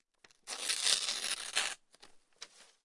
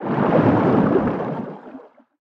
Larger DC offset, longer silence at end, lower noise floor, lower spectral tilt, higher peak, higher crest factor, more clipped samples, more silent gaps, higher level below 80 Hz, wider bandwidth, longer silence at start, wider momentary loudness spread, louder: neither; second, 0.2 s vs 0.5 s; first, -61 dBFS vs -43 dBFS; second, 3 dB/octave vs -10 dB/octave; second, -10 dBFS vs -4 dBFS; first, 28 dB vs 14 dB; neither; neither; second, -76 dBFS vs -50 dBFS; first, 11.5 kHz vs 6.4 kHz; first, 0.45 s vs 0 s; first, 23 LU vs 16 LU; second, -33 LUFS vs -18 LUFS